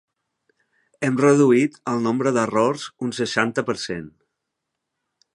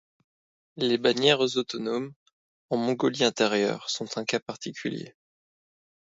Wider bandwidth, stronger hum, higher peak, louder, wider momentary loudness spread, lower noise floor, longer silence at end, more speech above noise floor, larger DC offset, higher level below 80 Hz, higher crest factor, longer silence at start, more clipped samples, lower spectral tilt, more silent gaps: first, 11.5 kHz vs 8 kHz; neither; first, -2 dBFS vs -6 dBFS; first, -21 LUFS vs -26 LUFS; about the same, 12 LU vs 13 LU; second, -80 dBFS vs under -90 dBFS; first, 1.25 s vs 1.05 s; second, 60 dB vs over 64 dB; neither; first, -64 dBFS vs -74 dBFS; about the same, 20 dB vs 22 dB; first, 1 s vs 0.75 s; neither; first, -5.5 dB/octave vs -4 dB/octave; second, none vs 2.16-2.26 s, 2.33-2.69 s, 4.42-4.46 s